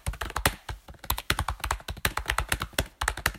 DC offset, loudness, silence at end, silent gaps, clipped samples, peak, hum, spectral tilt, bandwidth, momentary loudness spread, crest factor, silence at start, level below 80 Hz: under 0.1%; -30 LUFS; 0 s; none; under 0.1%; -4 dBFS; none; -2.5 dB/octave; 16.5 kHz; 6 LU; 28 dB; 0.05 s; -38 dBFS